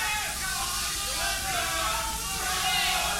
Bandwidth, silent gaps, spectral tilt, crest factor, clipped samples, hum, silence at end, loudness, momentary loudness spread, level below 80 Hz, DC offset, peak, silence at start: 17 kHz; none; -0.5 dB/octave; 16 dB; under 0.1%; none; 0 s; -27 LUFS; 5 LU; -42 dBFS; under 0.1%; -14 dBFS; 0 s